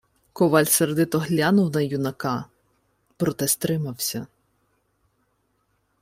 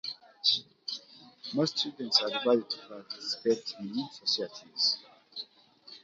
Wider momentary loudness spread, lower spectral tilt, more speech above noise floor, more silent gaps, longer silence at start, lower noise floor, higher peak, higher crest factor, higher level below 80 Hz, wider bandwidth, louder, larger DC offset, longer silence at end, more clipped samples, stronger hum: second, 9 LU vs 16 LU; about the same, -4.5 dB/octave vs -3.5 dB/octave; first, 48 dB vs 25 dB; neither; first, 0.35 s vs 0.05 s; first, -70 dBFS vs -57 dBFS; first, -4 dBFS vs -8 dBFS; about the same, 20 dB vs 24 dB; first, -60 dBFS vs -82 dBFS; first, 16 kHz vs 7.8 kHz; first, -22 LUFS vs -30 LUFS; neither; first, 1.75 s vs 0.05 s; neither; neither